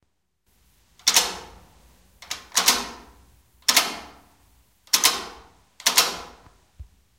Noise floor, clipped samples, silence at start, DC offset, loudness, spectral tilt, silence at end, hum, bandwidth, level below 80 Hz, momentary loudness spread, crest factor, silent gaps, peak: -71 dBFS; under 0.1%; 1.05 s; under 0.1%; -20 LUFS; 1 dB/octave; 0.35 s; none; 17 kHz; -56 dBFS; 18 LU; 22 dB; none; -4 dBFS